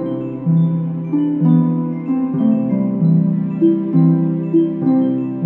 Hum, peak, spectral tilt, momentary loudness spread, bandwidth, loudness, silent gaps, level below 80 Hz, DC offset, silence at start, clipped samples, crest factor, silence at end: none; -2 dBFS; -13 dB/octave; 6 LU; 3.3 kHz; -16 LUFS; none; -60 dBFS; under 0.1%; 0 s; under 0.1%; 12 dB; 0 s